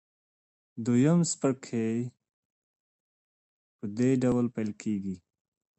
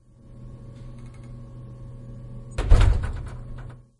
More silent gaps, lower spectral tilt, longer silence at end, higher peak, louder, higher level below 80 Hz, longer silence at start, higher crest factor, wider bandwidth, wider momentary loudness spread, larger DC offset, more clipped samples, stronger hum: first, 2.33-3.79 s vs none; about the same, -6.5 dB/octave vs -6.5 dB/octave; first, 0.6 s vs 0.25 s; second, -14 dBFS vs -2 dBFS; second, -28 LUFS vs -25 LUFS; second, -64 dBFS vs -26 dBFS; first, 0.75 s vs 0.4 s; about the same, 18 dB vs 22 dB; second, 8.8 kHz vs 11 kHz; second, 16 LU vs 22 LU; neither; neither; neither